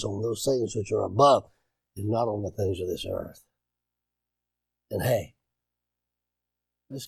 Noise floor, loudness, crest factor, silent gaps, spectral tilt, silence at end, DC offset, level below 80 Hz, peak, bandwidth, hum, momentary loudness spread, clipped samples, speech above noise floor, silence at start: -87 dBFS; -27 LUFS; 22 dB; none; -5.5 dB/octave; 0 s; under 0.1%; -58 dBFS; -8 dBFS; 17.5 kHz; 60 Hz at -60 dBFS; 17 LU; under 0.1%; 61 dB; 0 s